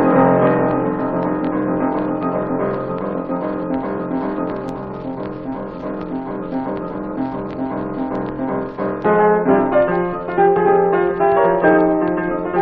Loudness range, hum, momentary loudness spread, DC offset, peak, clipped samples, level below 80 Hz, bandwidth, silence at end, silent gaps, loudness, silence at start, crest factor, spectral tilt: 10 LU; none; 12 LU; under 0.1%; -2 dBFS; under 0.1%; -44 dBFS; 4.8 kHz; 0 s; none; -19 LUFS; 0 s; 16 dB; -10.5 dB/octave